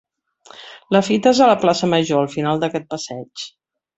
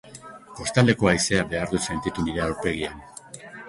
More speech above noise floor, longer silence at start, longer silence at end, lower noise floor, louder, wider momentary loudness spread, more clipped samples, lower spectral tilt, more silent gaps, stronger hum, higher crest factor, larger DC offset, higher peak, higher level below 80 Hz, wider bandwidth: first, 31 dB vs 20 dB; first, 0.6 s vs 0.05 s; first, 0.5 s vs 0 s; first, -48 dBFS vs -43 dBFS; first, -17 LUFS vs -24 LUFS; second, 19 LU vs 22 LU; neither; about the same, -5 dB/octave vs -4.5 dB/octave; neither; neither; about the same, 18 dB vs 20 dB; neither; about the same, -2 dBFS vs -4 dBFS; second, -60 dBFS vs -44 dBFS; second, 8.2 kHz vs 11.5 kHz